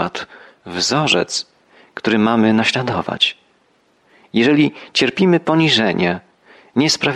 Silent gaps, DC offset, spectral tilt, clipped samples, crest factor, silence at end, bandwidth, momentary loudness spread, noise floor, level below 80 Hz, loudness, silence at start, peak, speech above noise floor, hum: none; under 0.1%; -4.5 dB/octave; under 0.1%; 16 dB; 0 s; 12.5 kHz; 12 LU; -58 dBFS; -58 dBFS; -16 LUFS; 0 s; -2 dBFS; 42 dB; none